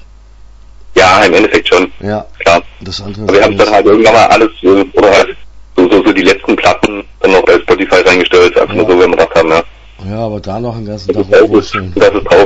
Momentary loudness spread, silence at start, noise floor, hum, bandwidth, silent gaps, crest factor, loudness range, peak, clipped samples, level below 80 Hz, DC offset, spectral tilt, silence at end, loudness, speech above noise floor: 13 LU; 0.85 s; -35 dBFS; none; 11 kHz; none; 8 dB; 3 LU; 0 dBFS; 0.9%; -34 dBFS; under 0.1%; -4.5 dB/octave; 0 s; -8 LUFS; 27 dB